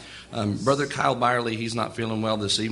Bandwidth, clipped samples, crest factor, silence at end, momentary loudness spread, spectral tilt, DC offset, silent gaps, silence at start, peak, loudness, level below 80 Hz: 11.5 kHz; under 0.1%; 18 dB; 0 s; 6 LU; -4.5 dB/octave; under 0.1%; none; 0 s; -6 dBFS; -25 LUFS; -56 dBFS